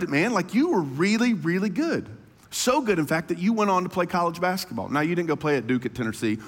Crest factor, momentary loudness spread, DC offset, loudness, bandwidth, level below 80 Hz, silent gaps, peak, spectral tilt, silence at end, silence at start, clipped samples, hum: 16 dB; 6 LU; under 0.1%; -24 LUFS; 17 kHz; -60 dBFS; none; -8 dBFS; -5 dB/octave; 0 s; 0 s; under 0.1%; none